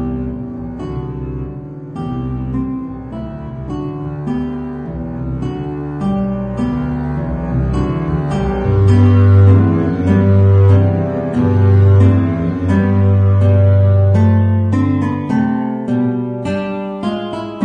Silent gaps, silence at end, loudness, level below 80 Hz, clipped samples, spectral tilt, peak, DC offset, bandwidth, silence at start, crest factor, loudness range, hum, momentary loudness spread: none; 0 s; -15 LUFS; -32 dBFS; under 0.1%; -10 dB/octave; 0 dBFS; under 0.1%; 4 kHz; 0 s; 14 dB; 12 LU; none; 15 LU